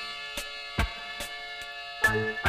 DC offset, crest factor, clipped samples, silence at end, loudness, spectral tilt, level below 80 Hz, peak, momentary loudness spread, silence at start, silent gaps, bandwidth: under 0.1%; 20 dB; under 0.1%; 0 s; -31 LUFS; -3.5 dB/octave; -42 dBFS; -10 dBFS; 12 LU; 0 s; none; 15.5 kHz